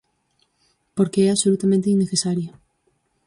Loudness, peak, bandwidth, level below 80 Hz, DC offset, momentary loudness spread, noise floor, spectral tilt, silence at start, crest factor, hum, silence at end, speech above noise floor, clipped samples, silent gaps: -20 LUFS; -6 dBFS; 11.5 kHz; -62 dBFS; under 0.1%; 11 LU; -68 dBFS; -5.5 dB/octave; 0.95 s; 16 dB; none; 0.8 s; 49 dB; under 0.1%; none